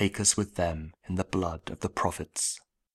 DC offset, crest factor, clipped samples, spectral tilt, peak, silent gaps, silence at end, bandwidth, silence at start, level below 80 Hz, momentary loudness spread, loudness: under 0.1%; 22 dB; under 0.1%; -3.5 dB/octave; -8 dBFS; none; 0.35 s; 15.5 kHz; 0 s; -48 dBFS; 11 LU; -30 LUFS